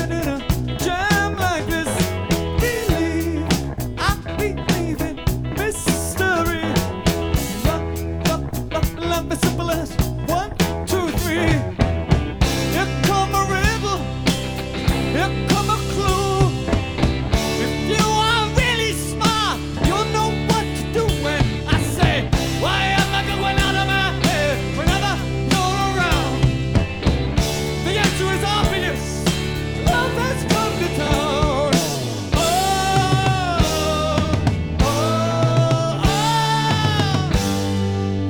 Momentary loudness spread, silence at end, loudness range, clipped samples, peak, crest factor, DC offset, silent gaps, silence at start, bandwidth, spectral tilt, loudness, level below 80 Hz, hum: 5 LU; 0 s; 3 LU; under 0.1%; -2 dBFS; 18 dB; under 0.1%; none; 0 s; over 20 kHz; -5 dB/octave; -20 LUFS; -30 dBFS; none